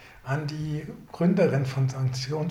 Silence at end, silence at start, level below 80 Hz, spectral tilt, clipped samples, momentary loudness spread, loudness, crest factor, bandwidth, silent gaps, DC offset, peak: 0 s; 0 s; -56 dBFS; -7 dB/octave; under 0.1%; 10 LU; -27 LUFS; 16 dB; 12 kHz; none; under 0.1%; -10 dBFS